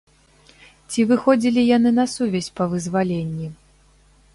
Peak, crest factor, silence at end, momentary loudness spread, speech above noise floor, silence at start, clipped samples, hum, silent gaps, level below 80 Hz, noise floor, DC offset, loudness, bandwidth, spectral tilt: -2 dBFS; 18 dB; 0.8 s; 11 LU; 35 dB; 0.9 s; under 0.1%; 50 Hz at -50 dBFS; none; -54 dBFS; -54 dBFS; under 0.1%; -20 LUFS; 11.5 kHz; -6 dB/octave